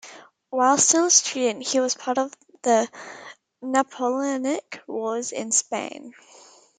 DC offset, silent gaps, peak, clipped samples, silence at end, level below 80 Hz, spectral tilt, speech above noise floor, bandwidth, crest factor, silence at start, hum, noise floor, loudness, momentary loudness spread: under 0.1%; none; -2 dBFS; under 0.1%; 0.7 s; -78 dBFS; -1 dB/octave; 23 dB; 10.5 kHz; 22 dB; 0.05 s; none; -47 dBFS; -22 LUFS; 17 LU